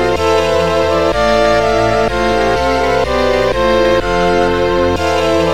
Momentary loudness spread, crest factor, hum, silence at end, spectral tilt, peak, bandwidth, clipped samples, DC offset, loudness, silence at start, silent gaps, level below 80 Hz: 2 LU; 12 dB; none; 0 s; -5 dB/octave; 0 dBFS; 16.5 kHz; under 0.1%; 3%; -13 LUFS; 0 s; none; -28 dBFS